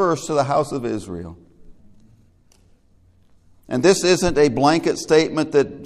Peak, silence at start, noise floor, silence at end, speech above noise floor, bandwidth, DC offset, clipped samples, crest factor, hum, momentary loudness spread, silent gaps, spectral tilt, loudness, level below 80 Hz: 0 dBFS; 0 s; -55 dBFS; 0 s; 36 dB; 13.5 kHz; under 0.1%; under 0.1%; 20 dB; none; 12 LU; none; -4.5 dB/octave; -18 LUFS; -46 dBFS